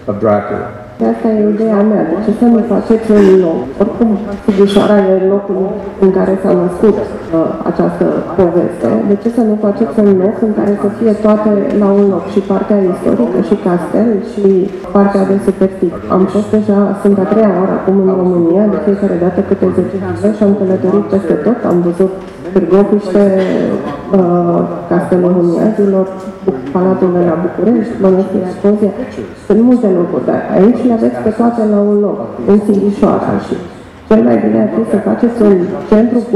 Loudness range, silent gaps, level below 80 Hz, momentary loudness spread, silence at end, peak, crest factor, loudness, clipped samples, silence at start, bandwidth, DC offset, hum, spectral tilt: 2 LU; none; -42 dBFS; 6 LU; 0 s; 0 dBFS; 10 dB; -11 LUFS; 0.2%; 0 s; 11.5 kHz; under 0.1%; none; -9 dB/octave